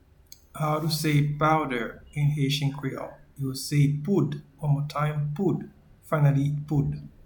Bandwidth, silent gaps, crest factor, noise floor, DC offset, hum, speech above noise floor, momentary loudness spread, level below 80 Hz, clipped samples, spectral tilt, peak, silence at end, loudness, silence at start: 19 kHz; none; 16 dB; -53 dBFS; under 0.1%; none; 28 dB; 11 LU; -52 dBFS; under 0.1%; -6.5 dB/octave; -10 dBFS; 0.2 s; -26 LUFS; 0.55 s